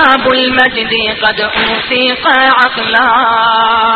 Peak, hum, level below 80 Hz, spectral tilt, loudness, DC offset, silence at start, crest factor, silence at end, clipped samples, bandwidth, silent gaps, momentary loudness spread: 0 dBFS; none; -42 dBFS; -5 dB/octave; -9 LUFS; under 0.1%; 0 s; 10 dB; 0 s; 0.1%; 8 kHz; none; 4 LU